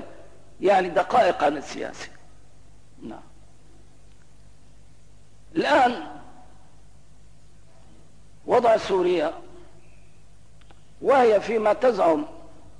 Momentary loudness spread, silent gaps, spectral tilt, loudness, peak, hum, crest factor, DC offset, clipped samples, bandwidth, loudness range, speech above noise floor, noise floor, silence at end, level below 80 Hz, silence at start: 22 LU; none; -5 dB/octave; -22 LUFS; -10 dBFS; 50 Hz at -60 dBFS; 16 dB; 0.7%; under 0.1%; 10.5 kHz; 8 LU; 33 dB; -54 dBFS; 0.4 s; -56 dBFS; 0 s